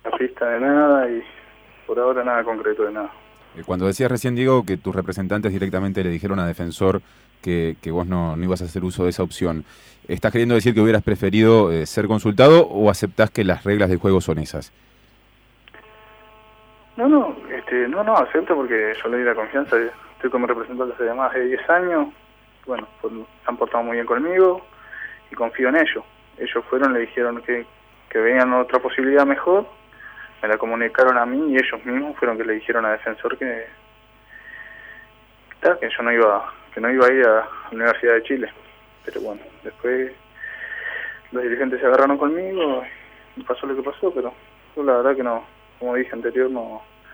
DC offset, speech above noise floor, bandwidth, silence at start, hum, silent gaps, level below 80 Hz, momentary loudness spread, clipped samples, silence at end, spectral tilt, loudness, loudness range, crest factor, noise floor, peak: under 0.1%; 35 dB; over 20 kHz; 0.05 s; 50 Hz at -55 dBFS; none; -52 dBFS; 15 LU; under 0.1%; 0.3 s; -6.5 dB/octave; -20 LUFS; 7 LU; 20 dB; -54 dBFS; -2 dBFS